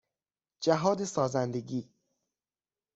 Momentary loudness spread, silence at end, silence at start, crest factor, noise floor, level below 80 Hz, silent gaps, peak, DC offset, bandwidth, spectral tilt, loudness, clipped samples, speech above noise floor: 10 LU; 1.1 s; 0.6 s; 22 dB; under -90 dBFS; -70 dBFS; none; -10 dBFS; under 0.1%; 8.2 kHz; -5.5 dB/octave; -31 LUFS; under 0.1%; over 61 dB